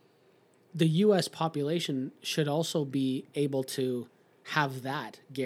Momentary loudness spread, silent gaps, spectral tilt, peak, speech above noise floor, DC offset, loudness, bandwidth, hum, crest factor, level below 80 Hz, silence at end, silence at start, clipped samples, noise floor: 12 LU; none; -5.5 dB/octave; -8 dBFS; 34 dB; under 0.1%; -30 LUFS; 16 kHz; none; 22 dB; -88 dBFS; 0 s; 0.75 s; under 0.1%; -64 dBFS